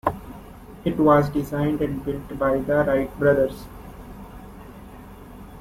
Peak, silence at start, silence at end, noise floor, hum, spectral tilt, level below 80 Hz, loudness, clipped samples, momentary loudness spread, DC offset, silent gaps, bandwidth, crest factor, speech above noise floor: -4 dBFS; 0.05 s; 0 s; -41 dBFS; none; -8 dB/octave; -44 dBFS; -22 LUFS; under 0.1%; 24 LU; under 0.1%; none; 16 kHz; 20 dB; 20 dB